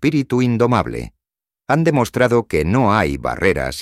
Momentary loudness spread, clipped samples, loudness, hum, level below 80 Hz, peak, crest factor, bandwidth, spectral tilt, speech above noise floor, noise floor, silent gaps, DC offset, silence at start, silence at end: 5 LU; under 0.1%; -17 LUFS; none; -38 dBFS; -2 dBFS; 16 dB; 15.5 kHz; -6.5 dB/octave; 71 dB; -87 dBFS; none; under 0.1%; 0 s; 0 s